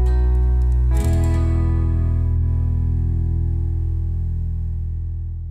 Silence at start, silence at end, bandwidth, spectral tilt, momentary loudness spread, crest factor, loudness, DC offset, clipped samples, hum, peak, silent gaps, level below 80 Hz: 0 s; 0 s; 9 kHz; -8.5 dB/octave; 7 LU; 10 dB; -21 LUFS; under 0.1%; under 0.1%; none; -8 dBFS; none; -20 dBFS